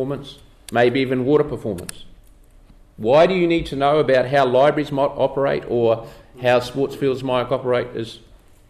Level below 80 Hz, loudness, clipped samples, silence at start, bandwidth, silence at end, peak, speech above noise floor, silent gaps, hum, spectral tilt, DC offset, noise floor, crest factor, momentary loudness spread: -46 dBFS; -19 LUFS; under 0.1%; 0 s; 14 kHz; 0.55 s; -6 dBFS; 29 dB; none; none; -6.5 dB/octave; under 0.1%; -48 dBFS; 14 dB; 13 LU